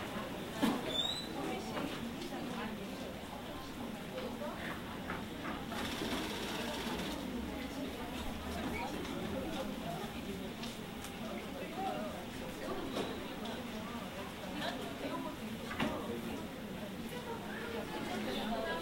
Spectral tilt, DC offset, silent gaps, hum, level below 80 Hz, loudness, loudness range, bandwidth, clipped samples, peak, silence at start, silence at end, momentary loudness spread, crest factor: -4.5 dB/octave; under 0.1%; none; none; -56 dBFS; -41 LUFS; 2 LU; 16 kHz; under 0.1%; -20 dBFS; 0 s; 0 s; 6 LU; 22 dB